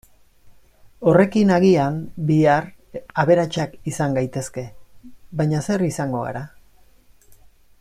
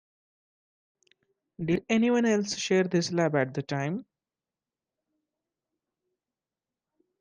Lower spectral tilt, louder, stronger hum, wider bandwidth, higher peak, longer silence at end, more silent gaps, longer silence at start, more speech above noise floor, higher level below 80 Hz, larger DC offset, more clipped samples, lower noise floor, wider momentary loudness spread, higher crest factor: first, -7 dB/octave vs -5.5 dB/octave; first, -20 LUFS vs -27 LUFS; neither; first, 14.5 kHz vs 10 kHz; first, -2 dBFS vs -12 dBFS; second, 1.35 s vs 3.2 s; neither; second, 0.45 s vs 1.6 s; second, 32 dB vs over 64 dB; first, -52 dBFS vs -68 dBFS; neither; neither; second, -51 dBFS vs under -90 dBFS; first, 17 LU vs 8 LU; about the same, 18 dB vs 18 dB